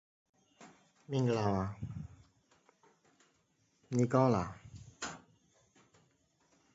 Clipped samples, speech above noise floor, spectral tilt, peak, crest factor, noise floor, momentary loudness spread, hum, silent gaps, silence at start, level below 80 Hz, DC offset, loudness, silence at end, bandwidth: under 0.1%; 43 dB; -7 dB/octave; -16 dBFS; 22 dB; -75 dBFS; 23 LU; none; none; 0.6 s; -62 dBFS; under 0.1%; -35 LUFS; 1.55 s; 7.6 kHz